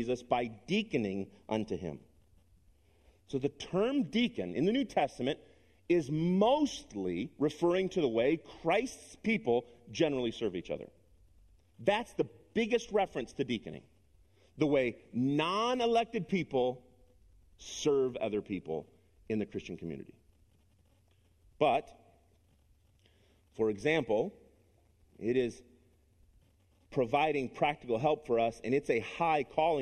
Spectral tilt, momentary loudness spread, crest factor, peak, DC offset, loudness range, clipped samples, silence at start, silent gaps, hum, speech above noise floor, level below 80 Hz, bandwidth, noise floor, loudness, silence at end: -6 dB/octave; 11 LU; 20 dB; -14 dBFS; under 0.1%; 6 LU; under 0.1%; 0 s; none; none; 36 dB; -64 dBFS; 12 kHz; -68 dBFS; -33 LUFS; 0 s